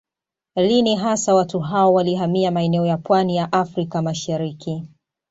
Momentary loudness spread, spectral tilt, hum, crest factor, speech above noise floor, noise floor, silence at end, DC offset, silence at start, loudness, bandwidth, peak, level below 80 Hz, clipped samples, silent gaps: 9 LU; -5.5 dB/octave; none; 16 dB; 69 dB; -87 dBFS; 0.45 s; under 0.1%; 0.55 s; -19 LUFS; 8 kHz; -4 dBFS; -60 dBFS; under 0.1%; none